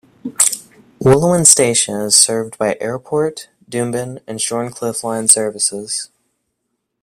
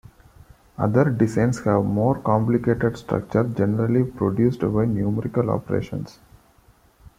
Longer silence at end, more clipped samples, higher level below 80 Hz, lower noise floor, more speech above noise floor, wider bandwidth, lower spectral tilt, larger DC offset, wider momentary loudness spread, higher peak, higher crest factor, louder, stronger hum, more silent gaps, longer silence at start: about the same, 1 s vs 1.1 s; first, 0.1% vs under 0.1%; about the same, -50 dBFS vs -48 dBFS; first, -73 dBFS vs -56 dBFS; first, 57 dB vs 35 dB; first, 16.5 kHz vs 12.5 kHz; second, -3 dB/octave vs -9 dB/octave; neither; first, 15 LU vs 7 LU; first, 0 dBFS vs -4 dBFS; about the same, 16 dB vs 18 dB; first, -14 LUFS vs -22 LUFS; neither; neither; second, 0.25 s vs 0.8 s